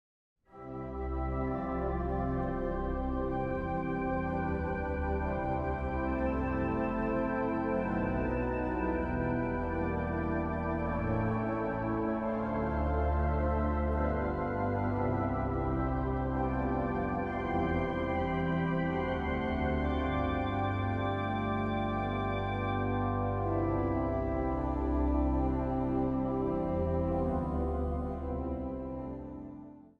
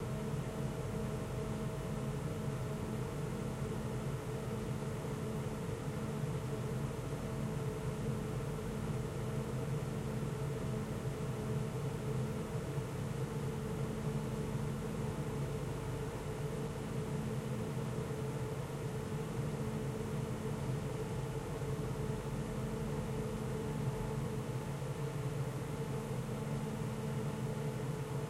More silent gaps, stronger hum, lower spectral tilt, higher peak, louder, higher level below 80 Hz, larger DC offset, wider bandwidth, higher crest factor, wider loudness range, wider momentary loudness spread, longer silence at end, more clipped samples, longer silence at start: neither; neither; first, -9.5 dB/octave vs -7 dB/octave; first, -18 dBFS vs -26 dBFS; first, -33 LUFS vs -40 LUFS; first, -40 dBFS vs -52 dBFS; neither; second, 5 kHz vs 16 kHz; about the same, 14 dB vs 12 dB; about the same, 2 LU vs 1 LU; about the same, 3 LU vs 2 LU; about the same, 0.1 s vs 0 s; neither; first, 0.55 s vs 0 s